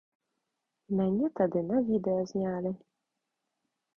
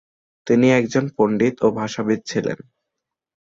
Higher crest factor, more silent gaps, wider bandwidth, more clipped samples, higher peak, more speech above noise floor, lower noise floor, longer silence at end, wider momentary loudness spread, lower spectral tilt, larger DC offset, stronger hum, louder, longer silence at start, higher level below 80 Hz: about the same, 18 dB vs 16 dB; neither; second, 7 kHz vs 7.8 kHz; neither; second, -14 dBFS vs -4 dBFS; second, 55 dB vs 64 dB; about the same, -85 dBFS vs -82 dBFS; first, 1.25 s vs 0.9 s; second, 7 LU vs 11 LU; first, -9 dB/octave vs -6 dB/octave; neither; neither; second, -30 LUFS vs -19 LUFS; first, 0.9 s vs 0.45 s; second, -66 dBFS vs -58 dBFS